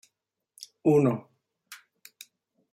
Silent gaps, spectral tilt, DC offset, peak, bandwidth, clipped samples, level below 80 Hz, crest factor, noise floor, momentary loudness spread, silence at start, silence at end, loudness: none; -7.5 dB/octave; under 0.1%; -10 dBFS; 15.5 kHz; under 0.1%; -72 dBFS; 20 dB; -82 dBFS; 26 LU; 0.85 s; 0.95 s; -25 LUFS